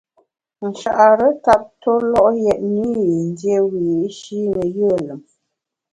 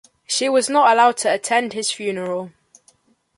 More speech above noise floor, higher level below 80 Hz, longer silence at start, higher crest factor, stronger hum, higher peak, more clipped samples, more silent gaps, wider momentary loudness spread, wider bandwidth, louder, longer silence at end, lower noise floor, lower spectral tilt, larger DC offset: first, 62 dB vs 40 dB; first, -52 dBFS vs -72 dBFS; first, 0.6 s vs 0.3 s; about the same, 18 dB vs 16 dB; neither; about the same, 0 dBFS vs -2 dBFS; neither; neither; about the same, 12 LU vs 12 LU; about the same, 11 kHz vs 11.5 kHz; about the same, -17 LUFS vs -18 LUFS; second, 0.75 s vs 0.9 s; first, -78 dBFS vs -58 dBFS; first, -7 dB/octave vs -2 dB/octave; neither